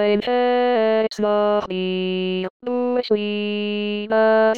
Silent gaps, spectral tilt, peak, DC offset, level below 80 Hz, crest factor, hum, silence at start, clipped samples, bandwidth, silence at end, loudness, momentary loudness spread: 2.50-2.60 s; -6.5 dB/octave; -6 dBFS; 0.3%; -62 dBFS; 12 dB; none; 0 s; under 0.1%; 7.6 kHz; 0 s; -20 LUFS; 6 LU